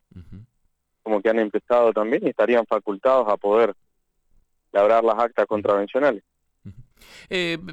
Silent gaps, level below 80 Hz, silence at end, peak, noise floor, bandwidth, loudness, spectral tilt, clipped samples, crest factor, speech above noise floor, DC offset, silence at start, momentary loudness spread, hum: none; -58 dBFS; 0 s; -8 dBFS; -69 dBFS; 9.2 kHz; -21 LUFS; -6 dB/octave; under 0.1%; 14 dB; 49 dB; under 0.1%; 0.15 s; 7 LU; none